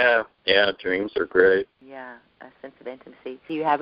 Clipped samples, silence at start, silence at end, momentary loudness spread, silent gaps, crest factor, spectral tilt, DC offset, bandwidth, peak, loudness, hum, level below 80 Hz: under 0.1%; 0 s; 0 s; 22 LU; none; 22 dB; -0.5 dB/octave; under 0.1%; 5.4 kHz; -2 dBFS; -21 LUFS; none; -60 dBFS